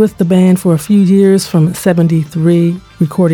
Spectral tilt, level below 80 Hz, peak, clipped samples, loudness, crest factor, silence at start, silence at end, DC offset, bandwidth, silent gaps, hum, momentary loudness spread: -7.5 dB/octave; -46 dBFS; 0 dBFS; under 0.1%; -11 LUFS; 10 dB; 0 s; 0 s; under 0.1%; 17 kHz; none; none; 5 LU